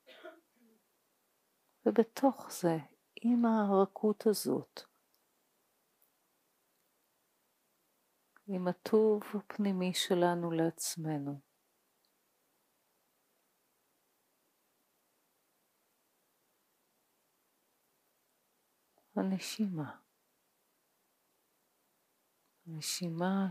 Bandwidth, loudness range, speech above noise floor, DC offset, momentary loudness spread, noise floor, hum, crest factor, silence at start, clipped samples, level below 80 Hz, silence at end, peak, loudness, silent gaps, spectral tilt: 15.5 kHz; 13 LU; 45 dB; under 0.1%; 14 LU; -77 dBFS; none; 24 dB; 0.1 s; under 0.1%; under -90 dBFS; 0 s; -14 dBFS; -33 LUFS; none; -5.5 dB/octave